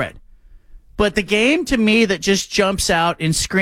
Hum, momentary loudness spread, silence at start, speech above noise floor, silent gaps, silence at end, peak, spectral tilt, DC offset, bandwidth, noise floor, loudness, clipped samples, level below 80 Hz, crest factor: none; 5 LU; 0 s; 28 dB; none; 0 s; -4 dBFS; -4 dB/octave; under 0.1%; 16 kHz; -44 dBFS; -17 LUFS; under 0.1%; -36 dBFS; 14 dB